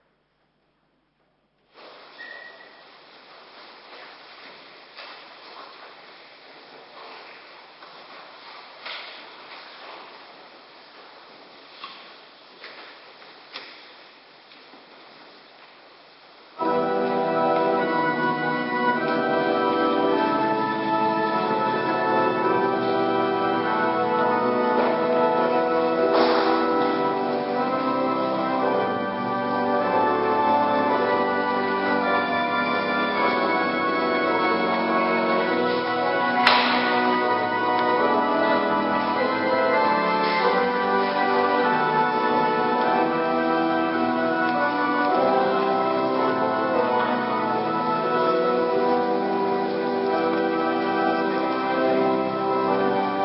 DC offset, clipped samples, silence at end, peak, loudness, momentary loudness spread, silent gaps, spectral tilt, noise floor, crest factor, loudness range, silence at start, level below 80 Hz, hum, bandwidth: under 0.1%; under 0.1%; 0 s; 0 dBFS; -22 LUFS; 20 LU; none; -7.5 dB/octave; -68 dBFS; 24 dB; 22 LU; 1.8 s; -66 dBFS; none; 5.8 kHz